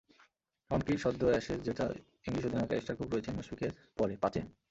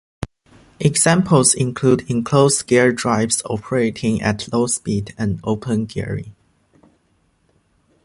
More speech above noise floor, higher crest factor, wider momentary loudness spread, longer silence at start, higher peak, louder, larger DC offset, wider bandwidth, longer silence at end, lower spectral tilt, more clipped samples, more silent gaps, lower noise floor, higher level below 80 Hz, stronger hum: second, 35 dB vs 44 dB; about the same, 20 dB vs 18 dB; about the same, 9 LU vs 11 LU; first, 0.7 s vs 0.2 s; second, -16 dBFS vs 0 dBFS; second, -35 LUFS vs -18 LUFS; neither; second, 8 kHz vs 11.5 kHz; second, 0.2 s vs 1.75 s; first, -7 dB/octave vs -4.5 dB/octave; neither; neither; first, -70 dBFS vs -62 dBFS; second, -56 dBFS vs -46 dBFS; neither